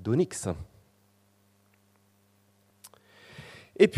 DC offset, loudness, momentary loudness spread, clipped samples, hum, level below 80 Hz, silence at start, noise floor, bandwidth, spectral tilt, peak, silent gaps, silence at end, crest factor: under 0.1%; -29 LUFS; 26 LU; under 0.1%; none; -60 dBFS; 0 s; -66 dBFS; 13.5 kHz; -5.5 dB/octave; -8 dBFS; none; 0 s; 24 dB